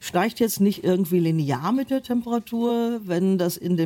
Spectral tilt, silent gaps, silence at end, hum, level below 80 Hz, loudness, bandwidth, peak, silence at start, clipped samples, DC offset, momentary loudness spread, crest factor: -6.5 dB/octave; none; 0 s; none; -62 dBFS; -23 LUFS; 17 kHz; -10 dBFS; 0 s; under 0.1%; under 0.1%; 4 LU; 12 dB